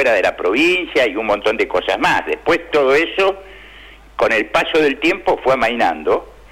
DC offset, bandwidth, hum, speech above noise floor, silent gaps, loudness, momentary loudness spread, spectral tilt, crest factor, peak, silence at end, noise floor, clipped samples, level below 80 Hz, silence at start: under 0.1%; 16 kHz; none; 24 dB; none; -16 LUFS; 5 LU; -4 dB/octave; 10 dB; -6 dBFS; 0.2 s; -40 dBFS; under 0.1%; -44 dBFS; 0 s